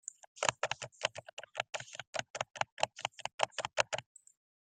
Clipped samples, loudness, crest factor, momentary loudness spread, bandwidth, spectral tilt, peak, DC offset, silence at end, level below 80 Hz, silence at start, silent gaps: under 0.1%; -38 LUFS; 32 dB; 8 LU; 9.8 kHz; -0.5 dB/octave; -8 dBFS; under 0.1%; 0.65 s; -76 dBFS; 0.35 s; 1.33-1.37 s, 2.07-2.13 s, 2.30-2.34 s, 2.72-2.77 s, 3.34-3.38 s